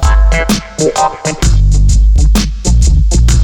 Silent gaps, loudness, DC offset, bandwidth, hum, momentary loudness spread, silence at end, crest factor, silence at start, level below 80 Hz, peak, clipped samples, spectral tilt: none; -11 LUFS; under 0.1%; 14.5 kHz; none; 4 LU; 0 s; 6 dB; 0 s; -8 dBFS; -2 dBFS; under 0.1%; -5 dB/octave